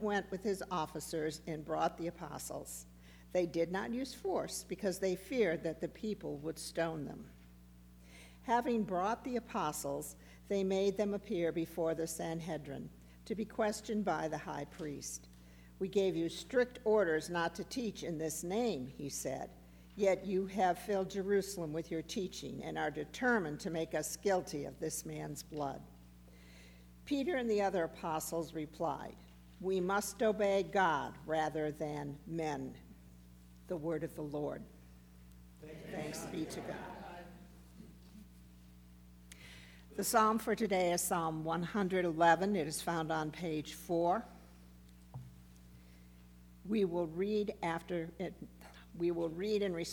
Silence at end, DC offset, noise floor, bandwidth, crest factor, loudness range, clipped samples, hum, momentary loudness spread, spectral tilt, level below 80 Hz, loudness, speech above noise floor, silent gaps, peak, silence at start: 0 s; under 0.1%; -58 dBFS; over 20 kHz; 22 dB; 8 LU; under 0.1%; 60 Hz at -60 dBFS; 20 LU; -4.5 dB/octave; -62 dBFS; -37 LUFS; 22 dB; none; -16 dBFS; 0 s